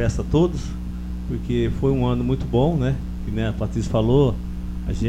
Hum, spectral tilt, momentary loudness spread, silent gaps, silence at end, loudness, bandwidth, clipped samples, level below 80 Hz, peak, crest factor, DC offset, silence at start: 60 Hz at -30 dBFS; -8 dB/octave; 12 LU; none; 0 s; -22 LUFS; 11.5 kHz; under 0.1%; -30 dBFS; -4 dBFS; 16 dB; under 0.1%; 0 s